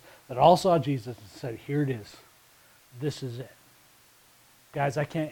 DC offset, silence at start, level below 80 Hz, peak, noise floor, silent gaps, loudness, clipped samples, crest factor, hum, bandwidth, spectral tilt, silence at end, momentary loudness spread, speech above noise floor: under 0.1%; 0.3 s; -62 dBFS; -6 dBFS; -59 dBFS; none; -27 LUFS; under 0.1%; 22 dB; none; 19 kHz; -6.5 dB/octave; 0 s; 20 LU; 32 dB